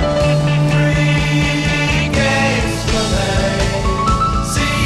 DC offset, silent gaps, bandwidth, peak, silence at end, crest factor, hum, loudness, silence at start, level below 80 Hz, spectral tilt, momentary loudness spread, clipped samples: under 0.1%; none; 13 kHz; -4 dBFS; 0 s; 10 dB; none; -15 LUFS; 0 s; -24 dBFS; -5 dB/octave; 3 LU; under 0.1%